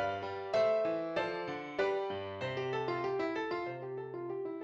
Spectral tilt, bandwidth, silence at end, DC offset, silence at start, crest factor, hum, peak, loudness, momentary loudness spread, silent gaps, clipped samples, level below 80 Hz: -6 dB/octave; 7.8 kHz; 0 s; under 0.1%; 0 s; 16 dB; none; -20 dBFS; -36 LUFS; 9 LU; none; under 0.1%; -72 dBFS